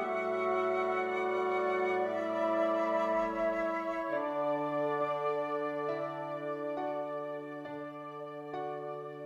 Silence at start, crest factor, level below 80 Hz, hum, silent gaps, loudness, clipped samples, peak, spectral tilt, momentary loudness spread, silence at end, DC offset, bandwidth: 0 s; 14 dB; -70 dBFS; none; none; -34 LUFS; under 0.1%; -20 dBFS; -6.5 dB/octave; 11 LU; 0 s; under 0.1%; 11 kHz